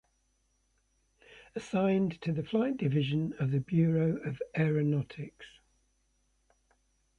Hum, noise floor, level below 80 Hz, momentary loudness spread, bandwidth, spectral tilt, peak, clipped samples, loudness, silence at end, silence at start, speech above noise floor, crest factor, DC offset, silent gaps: none; -74 dBFS; -64 dBFS; 14 LU; 7.6 kHz; -8.5 dB/octave; -16 dBFS; under 0.1%; -31 LUFS; 1.7 s; 1.55 s; 44 dB; 16 dB; under 0.1%; none